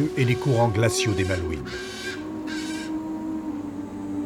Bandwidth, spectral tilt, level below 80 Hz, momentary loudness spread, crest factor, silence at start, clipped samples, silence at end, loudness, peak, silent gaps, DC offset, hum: 16 kHz; -5.5 dB/octave; -46 dBFS; 11 LU; 18 dB; 0 s; under 0.1%; 0 s; -26 LUFS; -8 dBFS; none; under 0.1%; none